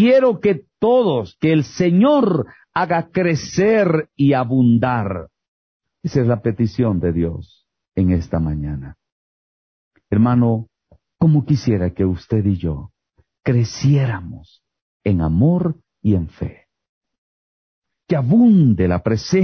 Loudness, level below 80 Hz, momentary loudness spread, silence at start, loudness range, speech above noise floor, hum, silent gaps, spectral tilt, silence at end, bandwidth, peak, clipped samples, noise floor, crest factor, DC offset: -18 LUFS; -36 dBFS; 12 LU; 0 s; 5 LU; 40 dB; none; 5.48-5.80 s, 9.12-9.91 s, 14.82-15.00 s, 16.89-17.01 s, 17.18-17.82 s; -8 dB/octave; 0 s; 6.6 kHz; -6 dBFS; under 0.1%; -56 dBFS; 12 dB; under 0.1%